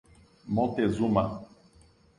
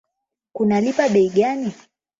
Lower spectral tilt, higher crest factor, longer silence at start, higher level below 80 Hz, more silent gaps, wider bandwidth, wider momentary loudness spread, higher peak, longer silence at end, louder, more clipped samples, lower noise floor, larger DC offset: first, -8 dB/octave vs -6.5 dB/octave; about the same, 20 dB vs 16 dB; about the same, 0.45 s vs 0.55 s; first, -54 dBFS vs -62 dBFS; neither; first, 10.5 kHz vs 7.8 kHz; second, 8 LU vs 12 LU; second, -10 dBFS vs -4 dBFS; first, 0.75 s vs 0.45 s; second, -28 LUFS vs -19 LUFS; neither; second, -59 dBFS vs -80 dBFS; neither